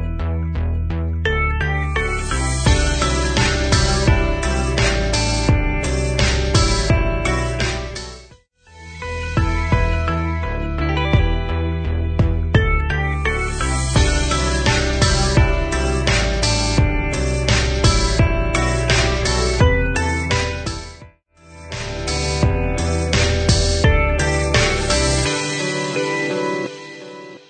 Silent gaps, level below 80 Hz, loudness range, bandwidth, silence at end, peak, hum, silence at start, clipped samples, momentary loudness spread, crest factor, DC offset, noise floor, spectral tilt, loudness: none; -22 dBFS; 4 LU; 9.4 kHz; 0.1 s; -2 dBFS; none; 0 s; under 0.1%; 7 LU; 16 dB; under 0.1%; -48 dBFS; -4.5 dB/octave; -18 LUFS